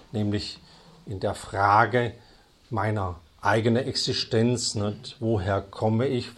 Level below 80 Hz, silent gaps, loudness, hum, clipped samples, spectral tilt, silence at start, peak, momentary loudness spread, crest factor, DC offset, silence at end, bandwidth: -54 dBFS; none; -26 LUFS; none; under 0.1%; -5 dB/octave; 0.15 s; -4 dBFS; 11 LU; 22 dB; under 0.1%; 0.05 s; 12 kHz